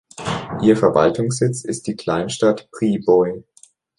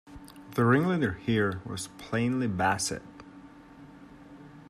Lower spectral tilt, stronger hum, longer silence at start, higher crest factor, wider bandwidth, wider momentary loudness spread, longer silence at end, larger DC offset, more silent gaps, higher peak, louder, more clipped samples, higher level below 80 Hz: about the same, -6 dB/octave vs -5.5 dB/octave; neither; first, 0.2 s vs 0.05 s; about the same, 18 dB vs 20 dB; second, 11.5 kHz vs 14.5 kHz; second, 11 LU vs 25 LU; first, 0.55 s vs 0.1 s; neither; neither; first, -2 dBFS vs -10 dBFS; first, -19 LUFS vs -28 LUFS; neither; first, -52 dBFS vs -58 dBFS